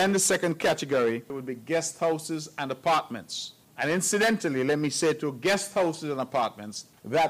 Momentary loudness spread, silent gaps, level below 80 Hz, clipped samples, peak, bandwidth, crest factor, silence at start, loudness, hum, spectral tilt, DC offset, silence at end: 12 LU; none; -70 dBFS; under 0.1%; -16 dBFS; 16 kHz; 12 dB; 0 s; -27 LUFS; none; -3.5 dB/octave; under 0.1%; 0 s